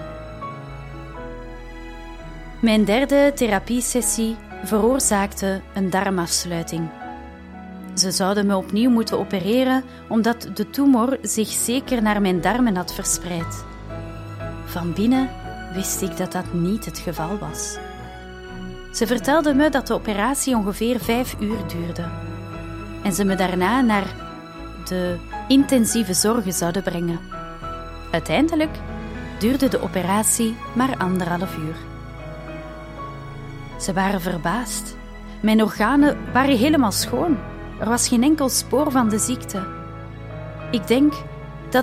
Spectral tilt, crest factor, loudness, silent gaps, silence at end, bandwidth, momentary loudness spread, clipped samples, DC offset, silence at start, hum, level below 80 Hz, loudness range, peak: -4 dB/octave; 18 dB; -21 LUFS; none; 0 s; 16 kHz; 18 LU; under 0.1%; under 0.1%; 0 s; none; -40 dBFS; 6 LU; -4 dBFS